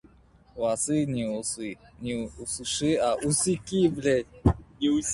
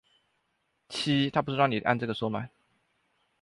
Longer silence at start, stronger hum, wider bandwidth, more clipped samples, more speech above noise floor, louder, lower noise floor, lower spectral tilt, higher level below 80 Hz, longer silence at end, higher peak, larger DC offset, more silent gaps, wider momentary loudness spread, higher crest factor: second, 0.55 s vs 0.9 s; neither; about the same, 11.5 kHz vs 11.5 kHz; neither; second, 31 dB vs 49 dB; about the same, -27 LUFS vs -28 LUFS; second, -57 dBFS vs -76 dBFS; second, -4.5 dB/octave vs -6 dB/octave; first, -44 dBFS vs -66 dBFS; second, 0 s vs 0.95 s; about the same, -8 dBFS vs -8 dBFS; neither; neither; about the same, 9 LU vs 11 LU; about the same, 20 dB vs 22 dB